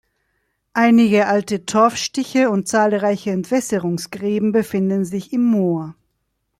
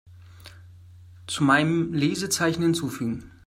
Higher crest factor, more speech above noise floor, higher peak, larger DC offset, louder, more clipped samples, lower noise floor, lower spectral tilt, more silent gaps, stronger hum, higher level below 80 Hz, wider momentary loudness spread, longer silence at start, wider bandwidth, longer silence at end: about the same, 16 dB vs 20 dB; first, 54 dB vs 24 dB; first, -2 dBFS vs -6 dBFS; neither; first, -18 LUFS vs -24 LUFS; neither; first, -72 dBFS vs -47 dBFS; about the same, -5.5 dB/octave vs -4.5 dB/octave; neither; neither; about the same, -60 dBFS vs -58 dBFS; about the same, 9 LU vs 11 LU; first, 0.75 s vs 0.1 s; second, 14 kHz vs 16 kHz; first, 0.7 s vs 0.2 s